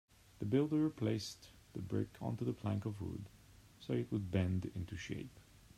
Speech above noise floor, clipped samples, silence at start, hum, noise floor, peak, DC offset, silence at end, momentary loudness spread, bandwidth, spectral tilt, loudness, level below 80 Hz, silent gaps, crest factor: 22 dB; under 0.1%; 0.4 s; none; -61 dBFS; -22 dBFS; under 0.1%; 0.35 s; 15 LU; 14.5 kHz; -7 dB/octave; -40 LUFS; -66 dBFS; none; 18 dB